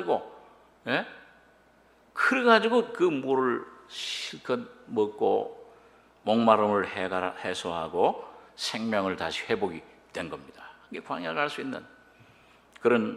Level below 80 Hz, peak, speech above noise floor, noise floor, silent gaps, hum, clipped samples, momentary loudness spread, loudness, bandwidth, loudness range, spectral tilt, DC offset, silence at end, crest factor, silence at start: -70 dBFS; -4 dBFS; 33 dB; -60 dBFS; none; none; under 0.1%; 19 LU; -28 LUFS; 13.5 kHz; 6 LU; -4.5 dB/octave; under 0.1%; 0 s; 24 dB; 0 s